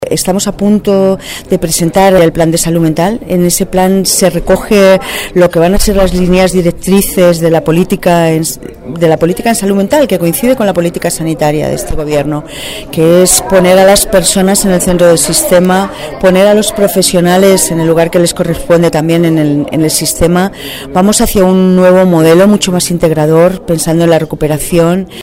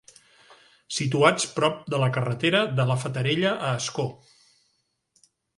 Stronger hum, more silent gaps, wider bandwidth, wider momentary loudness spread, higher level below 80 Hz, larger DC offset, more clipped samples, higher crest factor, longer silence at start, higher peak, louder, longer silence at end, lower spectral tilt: neither; neither; first, 16.5 kHz vs 11.5 kHz; about the same, 7 LU vs 9 LU; first, -26 dBFS vs -60 dBFS; neither; first, 0.6% vs under 0.1%; second, 8 dB vs 24 dB; second, 0 s vs 0.9 s; about the same, 0 dBFS vs -2 dBFS; first, -8 LUFS vs -24 LUFS; second, 0 s vs 1.45 s; about the same, -5 dB/octave vs -4.5 dB/octave